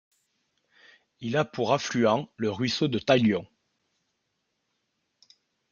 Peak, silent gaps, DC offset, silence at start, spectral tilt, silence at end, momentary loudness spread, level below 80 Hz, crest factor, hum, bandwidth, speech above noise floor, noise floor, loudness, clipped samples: -6 dBFS; none; under 0.1%; 1.2 s; -5.5 dB/octave; 2.25 s; 8 LU; -68 dBFS; 22 dB; none; 7.2 kHz; 53 dB; -78 dBFS; -26 LUFS; under 0.1%